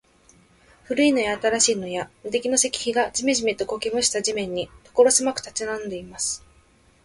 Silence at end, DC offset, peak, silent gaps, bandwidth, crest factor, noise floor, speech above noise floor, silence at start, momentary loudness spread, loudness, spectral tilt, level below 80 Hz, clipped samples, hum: 0.65 s; under 0.1%; -4 dBFS; none; 11.5 kHz; 20 dB; -57 dBFS; 34 dB; 0.9 s; 11 LU; -22 LUFS; -2 dB/octave; -56 dBFS; under 0.1%; none